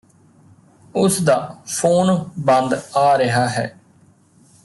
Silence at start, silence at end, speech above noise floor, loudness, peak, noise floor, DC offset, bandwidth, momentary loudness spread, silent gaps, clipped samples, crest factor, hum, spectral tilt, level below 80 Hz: 0.95 s; 0.95 s; 36 dB; -18 LUFS; -4 dBFS; -53 dBFS; under 0.1%; 12.5 kHz; 10 LU; none; under 0.1%; 16 dB; none; -5 dB/octave; -58 dBFS